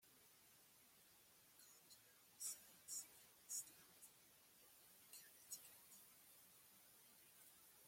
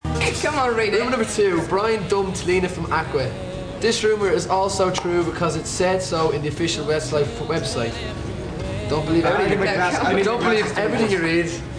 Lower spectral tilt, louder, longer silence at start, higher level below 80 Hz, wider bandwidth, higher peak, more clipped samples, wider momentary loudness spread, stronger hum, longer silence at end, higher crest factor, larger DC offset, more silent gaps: second, 0.5 dB/octave vs -4.5 dB/octave; second, -58 LUFS vs -21 LUFS; about the same, 0 s vs 0.05 s; second, under -90 dBFS vs -40 dBFS; first, 16.5 kHz vs 10.5 kHz; second, -36 dBFS vs -6 dBFS; neither; first, 17 LU vs 6 LU; neither; about the same, 0 s vs 0 s; first, 26 dB vs 14 dB; neither; neither